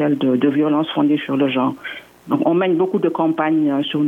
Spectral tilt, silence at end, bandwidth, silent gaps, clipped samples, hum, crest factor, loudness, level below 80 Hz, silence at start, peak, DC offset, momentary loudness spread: -8 dB/octave; 0 s; 3.8 kHz; none; under 0.1%; none; 14 dB; -18 LUFS; -68 dBFS; 0 s; -4 dBFS; under 0.1%; 6 LU